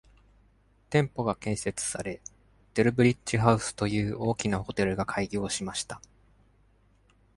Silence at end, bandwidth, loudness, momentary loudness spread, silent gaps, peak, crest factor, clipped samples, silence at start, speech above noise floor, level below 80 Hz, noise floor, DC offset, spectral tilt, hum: 1.4 s; 11.5 kHz; -28 LUFS; 11 LU; none; -6 dBFS; 24 dB; under 0.1%; 0.9 s; 36 dB; -52 dBFS; -63 dBFS; under 0.1%; -5 dB/octave; none